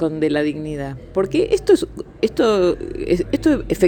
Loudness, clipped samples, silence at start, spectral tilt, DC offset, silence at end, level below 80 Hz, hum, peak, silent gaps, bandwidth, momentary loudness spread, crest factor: -19 LUFS; under 0.1%; 0 s; -6 dB/octave; under 0.1%; 0 s; -38 dBFS; none; -2 dBFS; none; 18 kHz; 10 LU; 16 dB